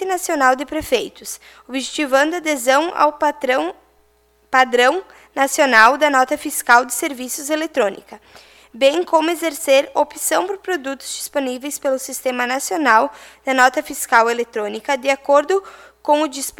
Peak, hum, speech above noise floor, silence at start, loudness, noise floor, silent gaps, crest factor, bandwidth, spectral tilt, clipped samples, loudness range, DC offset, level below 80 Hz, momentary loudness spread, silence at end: 0 dBFS; none; 40 dB; 0 s; -17 LUFS; -58 dBFS; none; 18 dB; 18.5 kHz; -1 dB/octave; under 0.1%; 4 LU; under 0.1%; -56 dBFS; 11 LU; 0.1 s